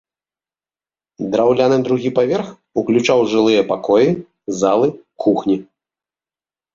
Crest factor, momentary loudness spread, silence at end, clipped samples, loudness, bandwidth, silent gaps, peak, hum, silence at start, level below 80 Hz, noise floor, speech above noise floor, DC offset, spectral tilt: 14 dB; 9 LU; 1.1 s; under 0.1%; -16 LUFS; 7.6 kHz; none; -2 dBFS; none; 1.2 s; -58 dBFS; under -90 dBFS; over 75 dB; under 0.1%; -6 dB/octave